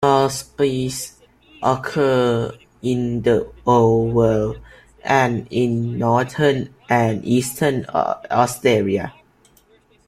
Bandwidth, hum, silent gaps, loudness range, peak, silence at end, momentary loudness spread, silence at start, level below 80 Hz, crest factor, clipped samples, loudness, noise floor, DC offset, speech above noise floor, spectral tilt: 16 kHz; none; none; 2 LU; -2 dBFS; 0.95 s; 9 LU; 0 s; -48 dBFS; 18 dB; under 0.1%; -19 LUFS; -55 dBFS; under 0.1%; 37 dB; -6 dB/octave